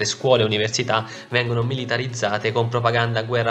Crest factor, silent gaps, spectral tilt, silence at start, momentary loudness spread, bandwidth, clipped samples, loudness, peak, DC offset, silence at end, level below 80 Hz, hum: 20 dB; none; -4.5 dB/octave; 0 s; 6 LU; 9 kHz; under 0.1%; -21 LUFS; -2 dBFS; under 0.1%; 0 s; -56 dBFS; none